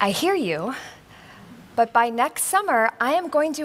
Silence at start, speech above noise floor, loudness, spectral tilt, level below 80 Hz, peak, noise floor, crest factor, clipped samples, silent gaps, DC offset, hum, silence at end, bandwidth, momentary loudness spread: 0 s; 24 dB; -22 LUFS; -3 dB/octave; -64 dBFS; -4 dBFS; -46 dBFS; 20 dB; under 0.1%; none; under 0.1%; none; 0 s; 16 kHz; 11 LU